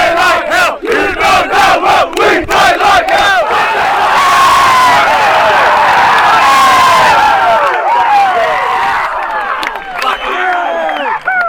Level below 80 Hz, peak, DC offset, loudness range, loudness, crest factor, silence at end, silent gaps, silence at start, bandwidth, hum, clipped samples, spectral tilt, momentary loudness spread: -38 dBFS; 0 dBFS; under 0.1%; 5 LU; -8 LUFS; 8 dB; 0 s; none; 0 s; over 20 kHz; none; under 0.1%; -2 dB/octave; 8 LU